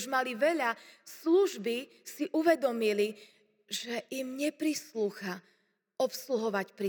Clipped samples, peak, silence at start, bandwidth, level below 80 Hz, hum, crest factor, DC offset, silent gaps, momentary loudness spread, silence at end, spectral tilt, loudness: under 0.1%; -14 dBFS; 0 s; over 20 kHz; under -90 dBFS; none; 18 dB; under 0.1%; none; 13 LU; 0 s; -3.5 dB/octave; -32 LUFS